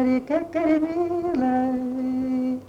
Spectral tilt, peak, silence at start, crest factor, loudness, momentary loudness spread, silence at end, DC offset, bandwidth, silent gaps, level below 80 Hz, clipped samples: -7.5 dB/octave; -10 dBFS; 0 s; 14 dB; -24 LUFS; 4 LU; 0 s; under 0.1%; 7 kHz; none; -54 dBFS; under 0.1%